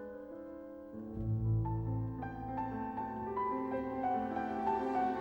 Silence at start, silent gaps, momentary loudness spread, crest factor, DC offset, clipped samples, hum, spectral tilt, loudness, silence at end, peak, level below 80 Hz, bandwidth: 0 s; none; 13 LU; 14 dB; under 0.1%; under 0.1%; none; -10 dB/octave; -37 LUFS; 0 s; -22 dBFS; -52 dBFS; 5.4 kHz